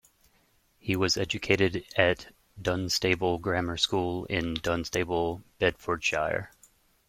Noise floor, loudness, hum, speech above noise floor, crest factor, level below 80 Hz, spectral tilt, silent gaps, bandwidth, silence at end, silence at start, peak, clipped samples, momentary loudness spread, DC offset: -67 dBFS; -28 LUFS; none; 39 dB; 24 dB; -54 dBFS; -4 dB/octave; none; 16.5 kHz; 0.6 s; 0.85 s; -6 dBFS; under 0.1%; 7 LU; under 0.1%